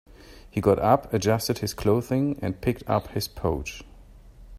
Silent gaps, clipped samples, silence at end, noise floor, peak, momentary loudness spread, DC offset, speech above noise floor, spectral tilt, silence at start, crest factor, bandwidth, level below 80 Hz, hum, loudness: none; under 0.1%; 0 s; -48 dBFS; -6 dBFS; 10 LU; under 0.1%; 23 dB; -6 dB/octave; 0.3 s; 20 dB; 16 kHz; -44 dBFS; none; -25 LUFS